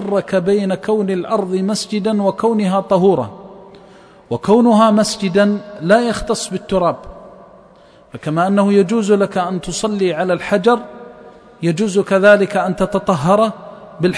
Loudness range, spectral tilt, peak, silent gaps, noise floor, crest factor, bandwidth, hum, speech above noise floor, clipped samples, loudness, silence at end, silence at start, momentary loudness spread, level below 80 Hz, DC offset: 3 LU; -6 dB/octave; 0 dBFS; none; -45 dBFS; 16 dB; 11 kHz; none; 31 dB; under 0.1%; -15 LUFS; 0 s; 0 s; 9 LU; -46 dBFS; under 0.1%